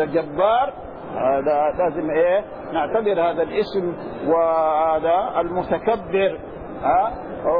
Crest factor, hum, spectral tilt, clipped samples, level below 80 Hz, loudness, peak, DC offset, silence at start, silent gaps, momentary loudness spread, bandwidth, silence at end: 14 dB; none; -9 dB/octave; under 0.1%; -48 dBFS; -21 LUFS; -6 dBFS; 0.3%; 0 s; none; 8 LU; 5.2 kHz; 0 s